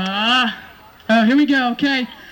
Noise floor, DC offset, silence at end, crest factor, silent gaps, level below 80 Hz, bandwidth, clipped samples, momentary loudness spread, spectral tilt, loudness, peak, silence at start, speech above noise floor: -41 dBFS; under 0.1%; 0 s; 14 dB; none; -56 dBFS; 17 kHz; under 0.1%; 10 LU; -4.5 dB/octave; -16 LUFS; -4 dBFS; 0 s; 26 dB